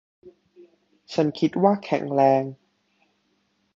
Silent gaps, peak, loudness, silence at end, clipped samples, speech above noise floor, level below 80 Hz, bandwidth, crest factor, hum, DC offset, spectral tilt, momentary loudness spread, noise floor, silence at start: none; -4 dBFS; -22 LUFS; 1.25 s; under 0.1%; 48 dB; -70 dBFS; 7.8 kHz; 22 dB; none; under 0.1%; -7.5 dB/octave; 8 LU; -69 dBFS; 0.25 s